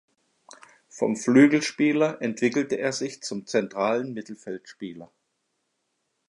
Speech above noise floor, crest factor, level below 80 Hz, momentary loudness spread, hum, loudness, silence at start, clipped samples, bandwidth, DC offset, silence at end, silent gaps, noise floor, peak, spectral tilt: 52 dB; 22 dB; -76 dBFS; 20 LU; none; -24 LUFS; 0.95 s; under 0.1%; 11 kHz; under 0.1%; 1.25 s; none; -76 dBFS; -4 dBFS; -5 dB/octave